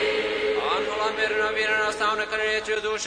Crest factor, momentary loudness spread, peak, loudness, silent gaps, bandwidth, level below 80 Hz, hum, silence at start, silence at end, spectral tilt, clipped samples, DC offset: 14 dB; 3 LU; -12 dBFS; -24 LUFS; none; 10.5 kHz; -54 dBFS; none; 0 s; 0 s; -1.5 dB/octave; under 0.1%; under 0.1%